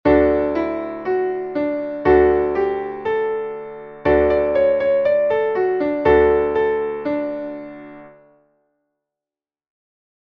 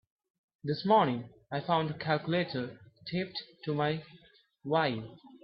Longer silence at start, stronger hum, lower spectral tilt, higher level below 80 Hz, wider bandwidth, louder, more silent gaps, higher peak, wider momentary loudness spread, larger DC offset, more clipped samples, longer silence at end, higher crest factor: second, 0.05 s vs 0.65 s; neither; about the same, -9 dB/octave vs -10 dB/octave; first, -40 dBFS vs -72 dBFS; about the same, 5.8 kHz vs 5.8 kHz; first, -19 LUFS vs -32 LUFS; neither; first, -4 dBFS vs -14 dBFS; second, 12 LU vs 15 LU; neither; neither; first, 2.2 s vs 0.05 s; about the same, 16 dB vs 20 dB